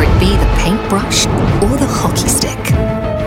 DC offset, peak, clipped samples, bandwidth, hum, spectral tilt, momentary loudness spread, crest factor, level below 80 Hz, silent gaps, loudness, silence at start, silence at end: under 0.1%; -2 dBFS; under 0.1%; 16.5 kHz; none; -4.5 dB/octave; 3 LU; 10 dB; -18 dBFS; none; -13 LUFS; 0 s; 0 s